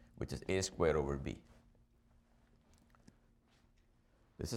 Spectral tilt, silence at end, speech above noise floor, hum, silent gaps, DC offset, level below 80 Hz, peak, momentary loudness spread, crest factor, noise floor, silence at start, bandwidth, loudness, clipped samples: -5 dB/octave; 0 s; 34 dB; none; none; under 0.1%; -56 dBFS; -20 dBFS; 13 LU; 22 dB; -71 dBFS; 0.2 s; 16 kHz; -38 LUFS; under 0.1%